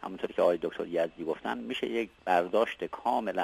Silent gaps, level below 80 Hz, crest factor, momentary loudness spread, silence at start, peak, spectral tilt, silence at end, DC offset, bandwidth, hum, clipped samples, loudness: none; -66 dBFS; 18 dB; 7 LU; 0 s; -12 dBFS; -5.5 dB/octave; 0 s; under 0.1%; 14 kHz; none; under 0.1%; -31 LUFS